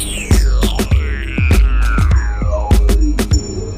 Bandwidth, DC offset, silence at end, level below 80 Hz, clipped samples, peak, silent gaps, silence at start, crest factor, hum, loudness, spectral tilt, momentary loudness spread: 15 kHz; under 0.1%; 0 s; -14 dBFS; under 0.1%; 0 dBFS; none; 0 s; 12 dB; none; -15 LUFS; -5.5 dB/octave; 4 LU